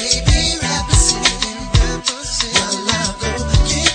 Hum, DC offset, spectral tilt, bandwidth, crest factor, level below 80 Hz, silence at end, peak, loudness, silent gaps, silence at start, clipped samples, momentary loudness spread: none; under 0.1%; -2.5 dB/octave; 9.4 kHz; 16 dB; -22 dBFS; 0 s; 0 dBFS; -16 LUFS; none; 0 s; under 0.1%; 6 LU